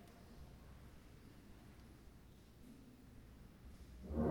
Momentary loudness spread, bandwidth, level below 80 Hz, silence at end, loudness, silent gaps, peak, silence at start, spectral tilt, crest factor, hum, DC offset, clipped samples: 6 LU; over 20 kHz; -58 dBFS; 0 s; -56 LUFS; none; -26 dBFS; 0 s; -8 dB/octave; 24 dB; none; under 0.1%; under 0.1%